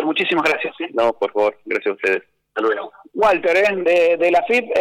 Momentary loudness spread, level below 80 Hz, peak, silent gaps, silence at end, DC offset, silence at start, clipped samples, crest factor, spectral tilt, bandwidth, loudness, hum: 8 LU; -60 dBFS; -8 dBFS; none; 0 s; under 0.1%; 0 s; under 0.1%; 10 dB; -4.5 dB/octave; 12.5 kHz; -18 LUFS; none